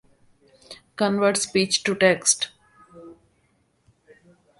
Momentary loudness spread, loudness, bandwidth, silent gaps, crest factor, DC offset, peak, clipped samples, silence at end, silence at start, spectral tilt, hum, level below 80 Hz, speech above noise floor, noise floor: 22 LU; -21 LUFS; 11.5 kHz; none; 22 dB; under 0.1%; -4 dBFS; under 0.1%; 1.45 s; 0.7 s; -2.5 dB/octave; none; -64 dBFS; 45 dB; -66 dBFS